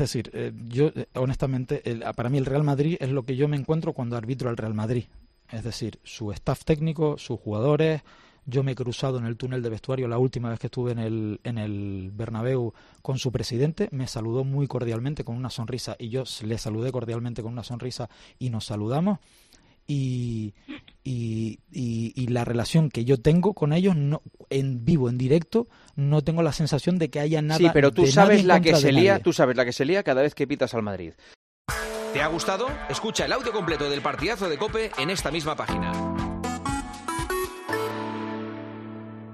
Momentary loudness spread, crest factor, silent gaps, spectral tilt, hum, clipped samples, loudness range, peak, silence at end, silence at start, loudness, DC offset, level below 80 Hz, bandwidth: 13 LU; 22 dB; 31.36-31.65 s; -6 dB/octave; none; under 0.1%; 11 LU; -2 dBFS; 0 s; 0 s; -25 LUFS; under 0.1%; -48 dBFS; 13 kHz